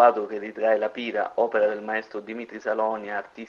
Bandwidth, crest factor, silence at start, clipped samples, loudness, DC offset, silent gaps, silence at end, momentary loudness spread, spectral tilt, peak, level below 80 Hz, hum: 6.8 kHz; 20 dB; 0 s; under 0.1%; -26 LUFS; under 0.1%; none; 0 s; 10 LU; -5.5 dB/octave; -4 dBFS; -74 dBFS; none